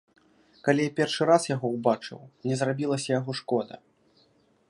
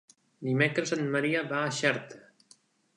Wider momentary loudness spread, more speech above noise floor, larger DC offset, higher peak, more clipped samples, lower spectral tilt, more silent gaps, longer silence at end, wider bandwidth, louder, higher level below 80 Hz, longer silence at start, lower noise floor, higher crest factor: about the same, 9 LU vs 10 LU; first, 38 dB vs 34 dB; neither; first, -6 dBFS vs -10 dBFS; neither; about the same, -5.5 dB/octave vs -5 dB/octave; neither; first, 0.95 s vs 0.8 s; about the same, 11.5 kHz vs 11 kHz; about the same, -27 LUFS vs -29 LUFS; about the same, -74 dBFS vs -76 dBFS; first, 0.65 s vs 0.4 s; about the same, -64 dBFS vs -63 dBFS; about the same, 22 dB vs 20 dB